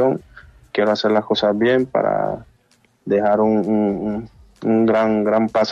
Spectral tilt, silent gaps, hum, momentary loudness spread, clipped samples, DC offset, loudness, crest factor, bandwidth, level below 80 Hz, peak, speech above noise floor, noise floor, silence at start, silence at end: -7 dB/octave; none; none; 10 LU; under 0.1%; under 0.1%; -18 LUFS; 14 dB; 7.2 kHz; -52 dBFS; -4 dBFS; 42 dB; -59 dBFS; 0 s; 0 s